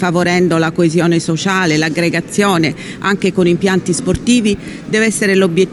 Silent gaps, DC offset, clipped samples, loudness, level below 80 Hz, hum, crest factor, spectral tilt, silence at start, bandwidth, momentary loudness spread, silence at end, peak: none; under 0.1%; under 0.1%; -14 LUFS; -42 dBFS; none; 12 dB; -5 dB/octave; 0 s; 12.5 kHz; 5 LU; 0 s; 0 dBFS